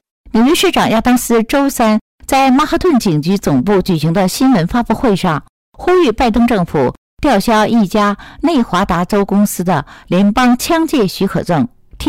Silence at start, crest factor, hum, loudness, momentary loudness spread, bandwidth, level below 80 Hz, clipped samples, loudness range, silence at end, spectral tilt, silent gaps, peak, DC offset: 0.25 s; 6 dB; none; -13 LUFS; 6 LU; 16 kHz; -34 dBFS; under 0.1%; 1 LU; 0 s; -5.5 dB/octave; 2.01-2.18 s, 5.49-5.72 s, 6.97-7.17 s; -6 dBFS; 0.2%